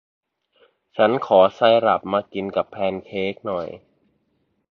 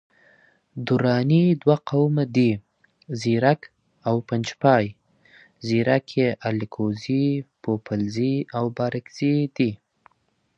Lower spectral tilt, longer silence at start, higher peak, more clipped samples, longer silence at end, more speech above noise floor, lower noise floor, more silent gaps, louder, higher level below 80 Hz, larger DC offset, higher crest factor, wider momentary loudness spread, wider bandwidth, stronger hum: about the same, -7 dB/octave vs -7.5 dB/octave; first, 0.95 s vs 0.75 s; about the same, -2 dBFS vs -2 dBFS; neither; first, 0.95 s vs 0.8 s; about the same, 49 dB vs 47 dB; about the same, -69 dBFS vs -68 dBFS; neither; first, -20 LUFS vs -23 LUFS; about the same, -60 dBFS vs -60 dBFS; neither; about the same, 20 dB vs 20 dB; first, 12 LU vs 9 LU; second, 6.2 kHz vs 8.4 kHz; neither